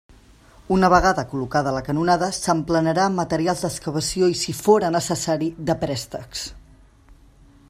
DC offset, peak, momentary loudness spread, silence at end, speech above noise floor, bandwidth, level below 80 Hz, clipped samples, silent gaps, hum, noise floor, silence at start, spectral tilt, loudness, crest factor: under 0.1%; -2 dBFS; 9 LU; 0.55 s; 30 dB; 15.5 kHz; -44 dBFS; under 0.1%; none; none; -50 dBFS; 0.7 s; -5 dB/octave; -21 LUFS; 20 dB